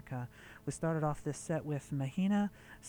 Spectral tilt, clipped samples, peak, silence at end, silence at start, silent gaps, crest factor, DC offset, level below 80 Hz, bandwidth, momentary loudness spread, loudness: -7 dB/octave; under 0.1%; -22 dBFS; 0 s; 0.05 s; none; 14 dB; under 0.1%; -62 dBFS; over 20 kHz; 11 LU; -37 LUFS